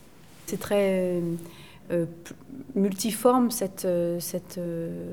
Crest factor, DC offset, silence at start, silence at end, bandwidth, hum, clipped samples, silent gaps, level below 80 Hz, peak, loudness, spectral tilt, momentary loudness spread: 20 dB; 0.2%; 0.3 s; 0 s; 20 kHz; none; under 0.1%; none; -60 dBFS; -6 dBFS; -27 LUFS; -5.5 dB/octave; 20 LU